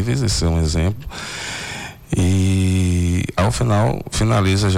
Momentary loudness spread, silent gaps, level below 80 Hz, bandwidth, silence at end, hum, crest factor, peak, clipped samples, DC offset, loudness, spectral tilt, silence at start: 10 LU; none; -32 dBFS; 14 kHz; 0 s; none; 8 dB; -10 dBFS; under 0.1%; under 0.1%; -19 LUFS; -5.5 dB/octave; 0 s